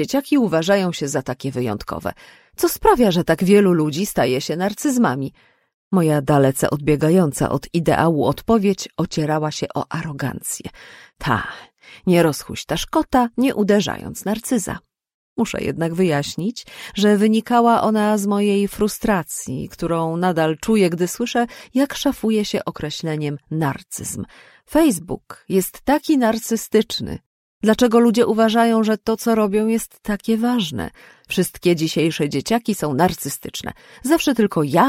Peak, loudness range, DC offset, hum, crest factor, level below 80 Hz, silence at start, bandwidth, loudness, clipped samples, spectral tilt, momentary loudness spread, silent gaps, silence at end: -2 dBFS; 5 LU; under 0.1%; none; 18 dB; -46 dBFS; 0 s; 16.5 kHz; -19 LUFS; under 0.1%; -5.5 dB/octave; 11 LU; 5.74-5.91 s, 15.14-15.36 s, 27.26-27.61 s; 0 s